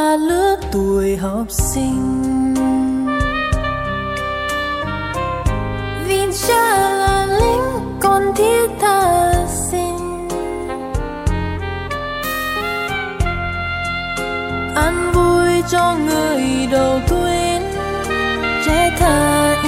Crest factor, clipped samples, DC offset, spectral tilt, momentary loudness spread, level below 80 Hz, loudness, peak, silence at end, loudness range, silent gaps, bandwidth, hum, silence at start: 14 dB; under 0.1%; under 0.1%; -4.5 dB/octave; 8 LU; -28 dBFS; -17 LUFS; -2 dBFS; 0 s; 6 LU; none; 16.5 kHz; none; 0 s